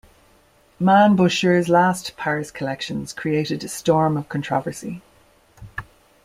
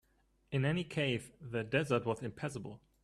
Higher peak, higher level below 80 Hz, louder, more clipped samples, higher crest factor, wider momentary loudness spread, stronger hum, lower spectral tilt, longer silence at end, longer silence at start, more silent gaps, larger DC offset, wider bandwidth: first, -2 dBFS vs -18 dBFS; first, -54 dBFS vs -66 dBFS; first, -20 LUFS vs -36 LUFS; neither; about the same, 18 dB vs 20 dB; first, 19 LU vs 9 LU; neither; about the same, -5.5 dB/octave vs -6 dB/octave; first, 0.4 s vs 0.25 s; first, 0.8 s vs 0.5 s; neither; neither; first, 15 kHz vs 12.5 kHz